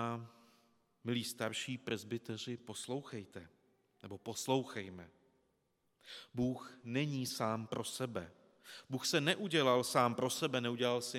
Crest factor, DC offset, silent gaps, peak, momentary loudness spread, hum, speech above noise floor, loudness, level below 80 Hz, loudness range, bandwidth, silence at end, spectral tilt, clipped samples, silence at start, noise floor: 22 dB; under 0.1%; none; -16 dBFS; 20 LU; none; 42 dB; -38 LUFS; -76 dBFS; 8 LU; 17 kHz; 0 s; -4 dB/octave; under 0.1%; 0 s; -80 dBFS